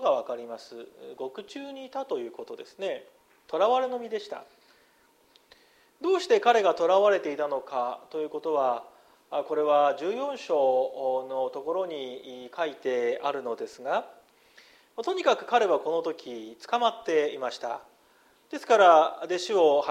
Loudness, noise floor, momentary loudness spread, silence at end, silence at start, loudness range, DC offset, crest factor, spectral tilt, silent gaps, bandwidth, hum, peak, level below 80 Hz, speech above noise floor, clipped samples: -27 LUFS; -63 dBFS; 18 LU; 0 s; 0 s; 7 LU; under 0.1%; 22 dB; -3.5 dB/octave; none; 13.5 kHz; none; -6 dBFS; -80 dBFS; 36 dB; under 0.1%